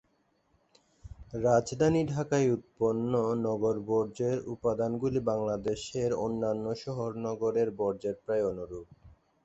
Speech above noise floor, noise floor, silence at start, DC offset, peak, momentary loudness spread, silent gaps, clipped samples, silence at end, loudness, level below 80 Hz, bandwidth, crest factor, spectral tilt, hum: 42 dB; -72 dBFS; 1.05 s; under 0.1%; -12 dBFS; 8 LU; none; under 0.1%; 0.35 s; -30 LUFS; -58 dBFS; 8.2 kHz; 18 dB; -7 dB/octave; none